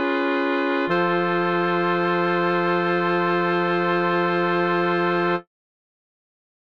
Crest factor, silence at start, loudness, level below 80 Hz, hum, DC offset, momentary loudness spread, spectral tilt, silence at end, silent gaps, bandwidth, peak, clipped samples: 14 dB; 0 s; -21 LUFS; -70 dBFS; none; 0.3%; 1 LU; -8 dB/octave; 1.35 s; none; 6.2 kHz; -8 dBFS; under 0.1%